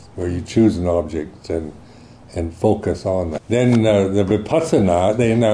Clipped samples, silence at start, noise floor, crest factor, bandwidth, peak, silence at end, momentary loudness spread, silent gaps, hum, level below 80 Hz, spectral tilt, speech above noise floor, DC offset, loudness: under 0.1%; 0.15 s; -42 dBFS; 14 dB; 11 kHz; -4 dBFS; 0 s; 12 LU; none; none; -40 dBFS; -7 dB/octave; 25 dB; under 0.1%; -18 LUFS